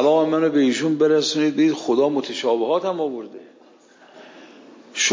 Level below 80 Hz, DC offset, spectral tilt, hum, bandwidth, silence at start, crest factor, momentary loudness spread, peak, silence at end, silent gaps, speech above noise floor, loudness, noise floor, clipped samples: -80 dBFS; under 0.1%; -3.5 dB/octave; none; 7.6 kHz; 0 s; 14 dB; 9 LU; -6 dBFS; 0 s; none; 32 dB; -20 LUFS; -51 dBFS; under 0.1%